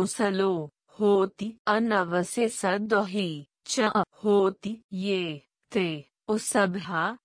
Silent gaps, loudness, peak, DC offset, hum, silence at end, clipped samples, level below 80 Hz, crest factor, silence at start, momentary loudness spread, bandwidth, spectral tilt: 1.59-1.65 s, 4.84-4.89 s; -27 LUFS; -10 dBFS; under 0.1%; none; 0.1 s; under 0.1%; -70 dBFS; 18 dB; 0 s; 10 LU; 10.5 kHz; -4.5 dB/octave